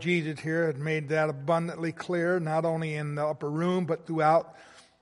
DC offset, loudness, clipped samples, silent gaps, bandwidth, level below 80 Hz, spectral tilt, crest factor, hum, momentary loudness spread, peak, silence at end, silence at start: under 0.1%; -28 LUFS; under 0.1%; none; 11.5 kHz; -72 dBFS; -7 dB/octave; 16 dB; none; 6 LU; -12 dBFS; 0.2 s; 0 s